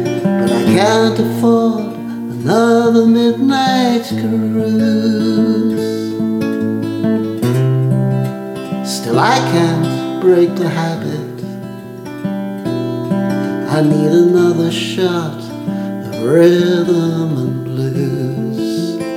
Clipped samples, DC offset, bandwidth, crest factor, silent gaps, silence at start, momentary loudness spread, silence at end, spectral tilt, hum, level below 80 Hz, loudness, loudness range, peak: under 0.1%; under 0.1%; 16.5 kHz; 14 dB; none; 0 s; 12 LU; 0 s; -6.5 dB/octave; none; -58 dBFS; -15 LUFS; 4 LU; 0 dBFS